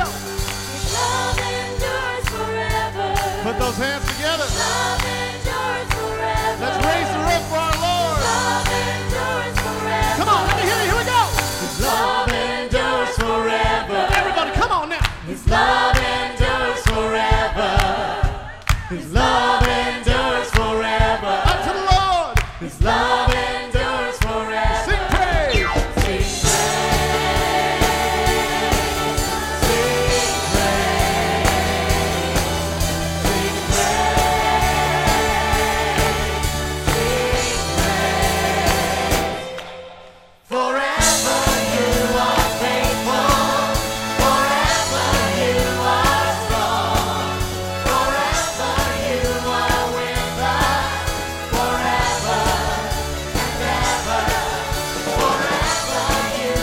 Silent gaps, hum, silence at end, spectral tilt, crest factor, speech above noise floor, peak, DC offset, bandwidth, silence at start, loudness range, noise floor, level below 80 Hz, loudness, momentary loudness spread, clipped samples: none; none; 0 s; -3.5 dB/octave; 18 dB; 24 dB; 0 dBFS; under 0.1%; 16.5 kHz; 0 s; 3 LU; -44 dBFS; -28 dBFS; -19 LUFS; 6 LU; under 0.1%